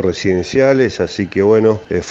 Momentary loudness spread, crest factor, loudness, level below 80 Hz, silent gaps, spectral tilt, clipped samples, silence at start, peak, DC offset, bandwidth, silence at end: 7 LU; 14 dB; -14 LUFS; -44 dBFS; none; -6 dB/octave; under 0.1%; 0 s; 0 dBFS; under 0.1%; 7.8 kHz; 0 s